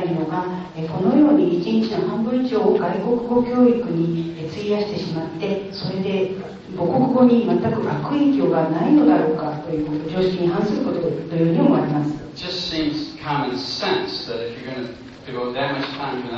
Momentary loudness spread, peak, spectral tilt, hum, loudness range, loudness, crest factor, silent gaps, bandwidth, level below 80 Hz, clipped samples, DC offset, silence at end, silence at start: 12 LU; -4 dBFS; -7.5 dB/octave; none; 7 LU; -20 LUFS; 16 dB; none; 7.2 kHz; -52 dBFS; under 0.1%; under 0.1%; 0 s; 0 s